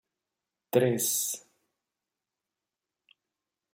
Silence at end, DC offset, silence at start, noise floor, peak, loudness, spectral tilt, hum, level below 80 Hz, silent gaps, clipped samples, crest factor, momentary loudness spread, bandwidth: 2.35 s; under 0.1%; 0.75 s; -89 dBFS; -10 dBFS; -28 LUFS; -4 dB/octave; none; -78 dBFS; none; under 0.1%; 24 dB; 8 LU; 16.5 kHz